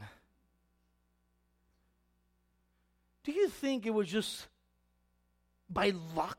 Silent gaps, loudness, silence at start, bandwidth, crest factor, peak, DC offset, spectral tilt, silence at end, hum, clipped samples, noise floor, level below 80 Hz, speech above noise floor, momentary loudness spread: none; -34 LUFS; 0 s; 16.5 kHz; 20 dB; -18 dBFS; under 0.1%; -4.5 dB/octave; 0.05 s; 60 Hz at -70 dBFS; under 0.1%; -75 dBFS; -66 dBFS; 42 dB; 13 LU